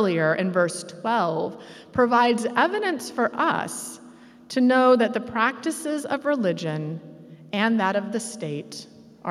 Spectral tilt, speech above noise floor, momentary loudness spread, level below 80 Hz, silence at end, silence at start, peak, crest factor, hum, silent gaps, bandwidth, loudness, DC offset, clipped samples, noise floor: -5 dB/octave; 24 dB; 15 LU; -66 dBFS; 0 s; 0 s; -6 dBFS; 18 dB; none; none; 14.5 kHz; -23 LUFS; under 0.1%; under 0.1%; -47 dBFS